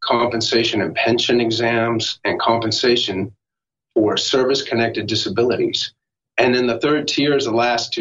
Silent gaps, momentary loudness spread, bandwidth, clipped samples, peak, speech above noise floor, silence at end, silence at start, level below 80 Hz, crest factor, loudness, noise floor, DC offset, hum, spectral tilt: none; 4 LU; 8 kHz; under 0.1%; -2 dBFS; 69 dB; 0 s; 0 s; -56 dBFS; 18 dB; -18 LUFS; -87 dBFS; under 0.1%; none; -4 dB/octave